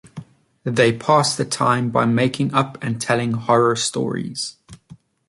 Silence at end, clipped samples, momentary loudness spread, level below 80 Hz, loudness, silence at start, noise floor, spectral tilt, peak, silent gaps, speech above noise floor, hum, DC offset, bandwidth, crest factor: 0.35 s; under 0.1%; 11 LU; -58 dBFS; -19 LUFS; 0.05 s; -47 dBFS; -4.5 dB/octave; -2 dBFS; none; 28 dB; none; under 0.1%; 11.5 kHz; 18 dB